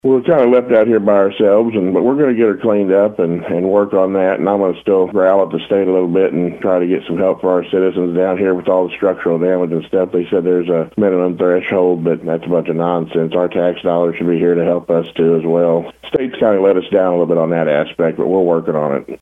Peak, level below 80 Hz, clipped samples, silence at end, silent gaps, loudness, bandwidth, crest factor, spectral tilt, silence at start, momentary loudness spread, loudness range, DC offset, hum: 0 dBFS; -56 dBFS; under 0.1%; 0.05 s; none; -14 LUFS; 3.8 kHz; 12 dB; -9 dB/octave; 0.05 s; 5 LU; 2 LU; under 0.1%; none